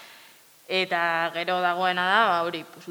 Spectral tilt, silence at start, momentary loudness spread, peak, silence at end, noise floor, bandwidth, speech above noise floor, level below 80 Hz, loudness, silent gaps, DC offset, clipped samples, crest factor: -4 dB/octave; 0 s; 7 LU; -6 dBFS; 0 s; -53 dBFS; over 20 kHz; 28 dB; -80 dBFS; -24 LUFS; none; under 0.1%; under 0.1%; 18 dB